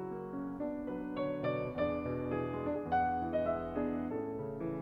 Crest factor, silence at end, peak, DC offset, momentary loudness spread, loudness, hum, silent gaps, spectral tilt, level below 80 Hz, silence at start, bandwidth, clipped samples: 14 dB; 0 s; -22 dBFS; under 0.1%; 7 LU; -37 LUFS; none; none; -9.5 dB/octave; -58 dBFS; 0 s; 5.6 kHz; under 0.1%